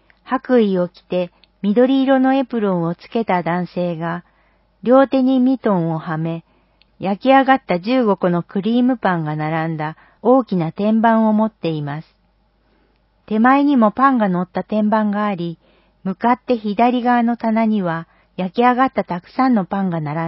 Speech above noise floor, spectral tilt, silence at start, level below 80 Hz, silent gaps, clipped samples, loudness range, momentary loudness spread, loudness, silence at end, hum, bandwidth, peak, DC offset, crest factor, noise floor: 43 dB; -12 dB/octave; 0.25 s; -58 dBFS; none; under 0.1%; 2 LU; 11 LU; -17 LUFS; 0 s; none; 5.8 kHz; 0 dBFS; under 0.1%; 18 dB; -60 dBFS